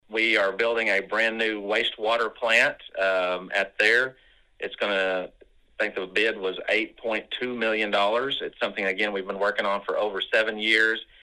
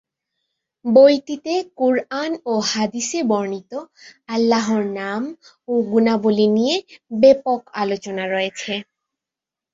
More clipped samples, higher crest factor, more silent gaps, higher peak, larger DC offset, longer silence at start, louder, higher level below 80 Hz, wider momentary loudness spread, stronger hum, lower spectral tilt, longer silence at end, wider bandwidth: neither; about the same, 22 dB vs 18 dB; neither; about the same, -4 dBFS vs -2 dBFS; neither; second, 0.1 s vs 0.85 s; second, -24 LUFS vs -19 LUFS; about the same, -64 dBFS vs -64 dBFS; second, 9 LU vs 13 LU; neither; second, -3 dB/octave vs -4.5 dB/octave; second, 0.2 s vs 0.9 s; first, 12.5 kHz vs 7.8 kHz